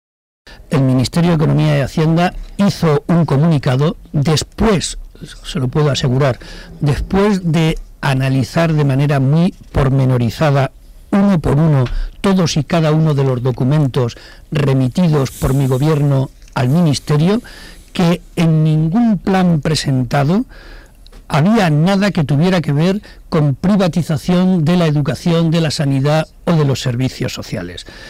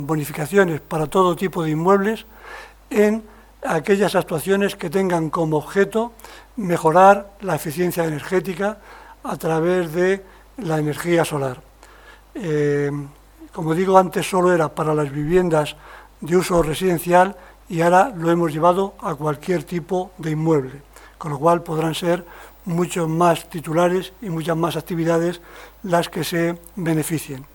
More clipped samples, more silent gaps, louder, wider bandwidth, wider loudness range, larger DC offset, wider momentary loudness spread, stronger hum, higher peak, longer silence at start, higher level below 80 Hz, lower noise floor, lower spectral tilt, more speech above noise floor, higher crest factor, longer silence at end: neither; neither; first, -15 LUFS vs -20 LUFS; second, 15 kHz vs 19 kHz; about the same, 2 LU vs 4 LU; neither; second, 7 LU vs 13 LU; neither; second, -6 dBFS vs 0 dBFS; first, 0.45 s vs 0 s; first, -32 dBFS vs -48 dBFS; second, -39 dBFS vs -46 dBFS; about the same, -7 dB/octave vs -6 dB/octave; about the same, 25 dB vs 26 dB; second, 8 dB vs 20 dB; about the same, 0 s vs 0.1 s